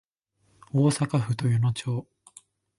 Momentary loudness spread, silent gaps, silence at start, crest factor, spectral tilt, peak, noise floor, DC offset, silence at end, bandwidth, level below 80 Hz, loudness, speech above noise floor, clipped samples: 8 LU; none; 0.75 s; 16 dB; -6.5 dB/octave; -12 dBFS; -69 dBFS; under 0.1%; 0.75 s; 11.5 kHz; -60 dBFS; -26 LUFS; 45 dB; under 0.1%